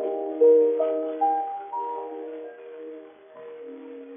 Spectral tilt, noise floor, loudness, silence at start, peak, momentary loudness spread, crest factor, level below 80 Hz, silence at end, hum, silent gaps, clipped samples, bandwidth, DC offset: -3 dB/octave; -45 dBFS; -24 LUFS; 0 s; -10 dBFS; 23 LU; 16 dB; under -90 dBFS; 0 s; none; none; under 0.1%; 3.6 kHz; under 0.1%